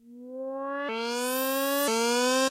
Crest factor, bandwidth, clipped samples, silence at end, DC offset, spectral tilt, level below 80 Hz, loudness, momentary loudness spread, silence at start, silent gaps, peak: 16 dB; 16 kHz; under 0.1%; 0 s; under 0.1%; -1 dB/octave; -84 dBFS; -27 LUFS; 12 LU; 0.05 s; none; -12 dBFS